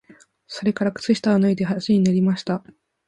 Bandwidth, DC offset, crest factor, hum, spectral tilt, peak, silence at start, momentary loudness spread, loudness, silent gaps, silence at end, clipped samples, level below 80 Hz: 10.5 kHz; under 0.1%; 14 dB; none; -7 dB/octave; -6 dBFS; 0.5 s; 9 LU; -21 LUFS; none; 0.5 s; under 0.1%; -60 dBFS